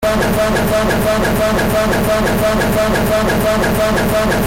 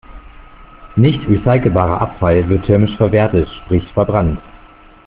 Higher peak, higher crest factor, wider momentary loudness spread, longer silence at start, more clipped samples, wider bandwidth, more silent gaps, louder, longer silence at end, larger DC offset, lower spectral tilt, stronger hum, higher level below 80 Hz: second, -6 dBFS vs -2 dBFS; second, 8 dB vs 14 dB; second, 0 LU vs 5 LU; about the same, 0 s vs 0.1 s; neither; first, 17 kHz vs 4.4 kHz; neither; about the same, -14 LUFS vs -14 LUFS; second, 0 s vs 0.5 s; neither; second, -5 dB/octave vs -7.5 dB/octave; neither; first, -26 dBFS vs -32 dBFS